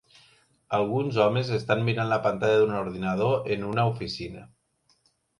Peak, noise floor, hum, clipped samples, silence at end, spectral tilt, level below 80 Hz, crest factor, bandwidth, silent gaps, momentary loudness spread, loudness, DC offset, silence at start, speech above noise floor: -6 dBFS; -69 dBFS; none; under 0.1%; 0.95 s; -7 dB/octave; -58 dBFS; 20 dB; 11.5 kHz; none; 10 LU; -26 LUFS; under 0.1%; 0.7 s; 44 dB